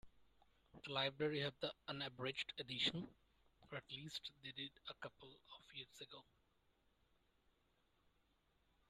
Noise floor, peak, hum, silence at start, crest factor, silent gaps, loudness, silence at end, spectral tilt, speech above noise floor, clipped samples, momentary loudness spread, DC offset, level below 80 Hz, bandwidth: -80 dBFS; -26 dBFS; none; 0.05 s; 24 dB; none; -46 LUFS; 2.7 s; -4.5 dB/octave; 32 dB; under 0.1%; 17 LU; under 0.1%; -78 dBFS; 13 kHz